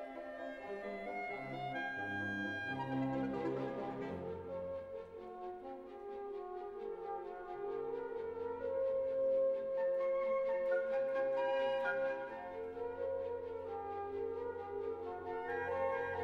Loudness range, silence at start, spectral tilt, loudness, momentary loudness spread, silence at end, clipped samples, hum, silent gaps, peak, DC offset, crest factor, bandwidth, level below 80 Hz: 9 LU; 0 s; -7 dB/octave; -40 LUFS; 11 LU; 0 s; under 0.1%; none; none; -26 dBFS; under 0.1%; 14 dB; 6.8 kHz; -70 dBFS